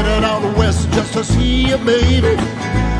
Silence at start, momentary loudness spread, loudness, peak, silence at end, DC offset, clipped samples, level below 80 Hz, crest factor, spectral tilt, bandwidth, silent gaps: 0 s; 5 LU; -15 LUFS; -2 dBFS; 0 s; under 0.1%; under 0.1%; -20 dBFS; 14 dB; -5.5 dB/octave; 10.5 kHz; none